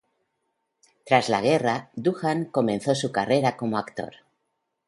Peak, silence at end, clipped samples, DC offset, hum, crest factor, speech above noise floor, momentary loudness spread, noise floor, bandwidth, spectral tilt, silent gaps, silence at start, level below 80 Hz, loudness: -4 dBFS; 0.8 s; under 0.1%; under 0.1%; none; 22 dB; 54 dB; 8 LU; -78 dBFS; 11.5 kHz; -5.5 dB/octave; none; 1.05 s; -66 dBFS; -24 LUFS